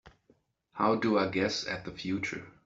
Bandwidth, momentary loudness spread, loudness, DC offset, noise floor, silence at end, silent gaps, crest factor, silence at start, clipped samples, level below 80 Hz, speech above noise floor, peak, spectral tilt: 8 kHz; 9 LU; -31 LUFS; under 0.1%; -69 dBFS; 0.15 s; none; 20 dB; 0.05 s; under 0.1%; -64 dBFS; 38 dB; -12 dBFS; -5 dB/octave